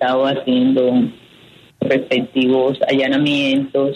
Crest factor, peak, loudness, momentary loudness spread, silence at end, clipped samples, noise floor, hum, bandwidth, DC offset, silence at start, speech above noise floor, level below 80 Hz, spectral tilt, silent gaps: 14 dB; -2 dBFS; -16 LUFS; 4 LU; 0 s; under 0.1%; -46 dBFS; none; 9 kHz; under 0.1%; 0 s; 30 dB; -60 dBFS; -6.5 dB/octave; none